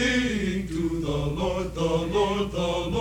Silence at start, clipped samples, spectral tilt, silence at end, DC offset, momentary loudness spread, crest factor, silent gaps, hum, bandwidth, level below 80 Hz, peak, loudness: 0 s; under 0.1%; -5.5 dB/octave; 0 s; under 0.1%; 4 LU; 14 dB; none; none; 17 kHz; -38 dBFS; -10 dBFS; -26 LUFS